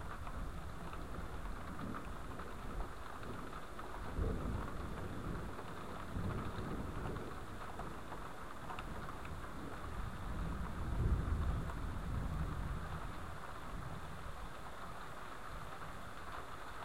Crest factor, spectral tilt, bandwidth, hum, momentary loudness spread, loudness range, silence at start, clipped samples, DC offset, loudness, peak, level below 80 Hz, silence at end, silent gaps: 20 dB; -6.5 dB/octave; 16 kHz; none; 8 LU; 6 LU; 0 s; under 0.1%; 0.4%; -46 LUFS; -24 dBFS; -46 dBFS; 0 s; none